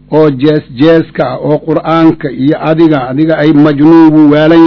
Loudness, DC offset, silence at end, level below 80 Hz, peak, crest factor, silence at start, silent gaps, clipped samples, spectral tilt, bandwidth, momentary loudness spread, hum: -7 LUFS; under 0.1%; 0 s; -40 dBFS; 0 dBFS; 6 dB; 0.1 s; none; 10%; -9 dB/octave; 6 kHz; 8 LU; none